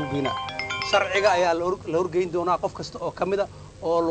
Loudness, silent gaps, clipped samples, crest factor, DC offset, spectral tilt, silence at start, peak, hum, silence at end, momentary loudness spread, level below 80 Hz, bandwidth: -25 LUFS; none; under 0.1%; 16 dB; under 0.1%; -4.5 dB/octave; 0 s; -8 dBFS; none; 0 s; 11 LU; -52 dBFS; 9 kHz